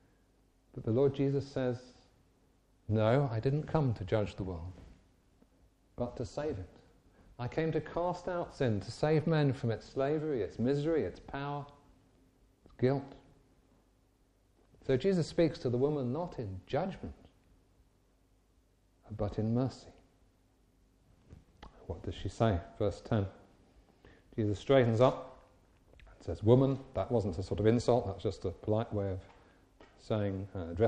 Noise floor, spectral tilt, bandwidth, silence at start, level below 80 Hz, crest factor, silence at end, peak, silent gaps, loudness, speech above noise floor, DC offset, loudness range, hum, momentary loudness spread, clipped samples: -69 dBFS; -8 dB/octave; 9.6 kHz; 0.75 s; -56 dBFS; 24 dB; 0 s; -10 dBFS; none; -33 LUFS; 37 dB; under 0.1%; 9 LU; none; 15 LU; under 0.1%